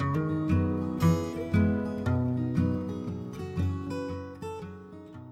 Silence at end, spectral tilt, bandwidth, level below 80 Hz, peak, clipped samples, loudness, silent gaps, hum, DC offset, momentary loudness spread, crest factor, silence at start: 0 s; -8.5 dB/octave; 15 kHz; -50 dBFS; -12 dBFS; under 0.1%; -30 LUFS; none; none; under 0.1%; 13 LU; 16 dB; 0 s